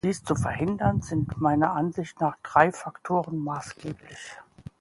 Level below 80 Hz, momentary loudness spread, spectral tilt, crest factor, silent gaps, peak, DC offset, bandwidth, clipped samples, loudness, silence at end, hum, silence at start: -48 dBFS; 18 LU; -6.5 dB/octave; 22 dB; none; -4 dBFS; under 0.1%; 11.5 kHz; under 0.1%; -26 LUFS; 0.2 s; none; 0.05 s